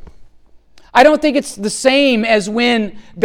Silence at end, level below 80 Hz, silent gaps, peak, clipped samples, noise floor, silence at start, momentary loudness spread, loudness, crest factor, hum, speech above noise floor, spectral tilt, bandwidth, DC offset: 0 s; -46 dBFS; none; 0 dBFS; under 0.1%; -44 dBFS; 0 s; 8 LU; -13 LUFS; 14 dB; none; 31 dB; -3.5 dB/octave; 16 kHz; under 0.1%